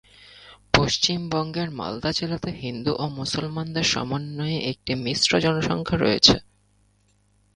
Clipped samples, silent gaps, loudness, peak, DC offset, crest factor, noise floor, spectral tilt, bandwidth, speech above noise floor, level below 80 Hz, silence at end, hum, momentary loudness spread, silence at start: under 0.1%; none; -23 LUFS; 0 dBFS; under 0.1%; 24 dB; -63 dBFS; -4 dB/octave; 11 kHz; 39 dB; -46 dBFS; 1.15 s; none; 12 LU; 0.2 s